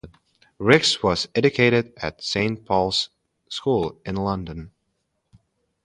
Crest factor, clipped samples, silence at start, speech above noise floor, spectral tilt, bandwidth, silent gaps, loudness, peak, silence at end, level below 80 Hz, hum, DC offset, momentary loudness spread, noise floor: 24 dB; under 0.1%; 0.05 s; 52 dB; -4.5 dB/octave; 11.5 kHz; none; -22 LUFS; 0 dBFS; 1.15 s; -48 dBFS; none; under 0.1%; 14 LU; -74 dBFS